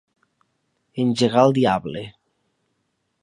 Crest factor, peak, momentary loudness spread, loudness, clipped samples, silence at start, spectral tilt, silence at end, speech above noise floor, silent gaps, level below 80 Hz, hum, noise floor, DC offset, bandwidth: 22 dB; -2 dBFS; 19 LU; -19 LUFS; under 0.1%; 0.95 s; -6.5 dB/octave; 1.1 s; 54 dB; none; -58 dBFS; none; -73 dBFS; under 0.1%; 11 kHz